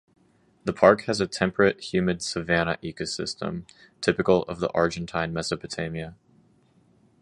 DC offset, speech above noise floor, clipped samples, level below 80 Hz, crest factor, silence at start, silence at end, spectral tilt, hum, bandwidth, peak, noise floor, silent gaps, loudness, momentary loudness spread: under 0.1%; 36 dB; under 0.1%; -52 dBFS; 24 dB; 0.65 s; 1.1 s; -5 dB/octave; none; 11.5 kHz; -2 dBFS; -61 dBFS; none; -25 LUFS; 13 LU